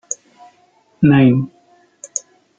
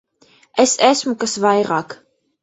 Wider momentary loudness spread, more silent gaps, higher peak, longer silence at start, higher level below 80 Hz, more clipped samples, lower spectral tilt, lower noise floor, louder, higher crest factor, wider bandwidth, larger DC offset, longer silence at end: first, 17 LU vs 11 LU; neither; about the same, -2 dBFS vs 0 dBFS; second, 0.1 s vs 0.55 s; first, -54 dBFS vs -62 dBFS; neither; first, -6.5 dB/octave vs -3 dB/octave; about the same, -56 dBFS vs -54 dBFS; about the same, -15 LUFS vs -17 LUFS; about the same, 16 dB vs 18 dB; first, 9.4 kHz vs 8.4 kHz; neither; about the same, 0.4 s vs 0.5 s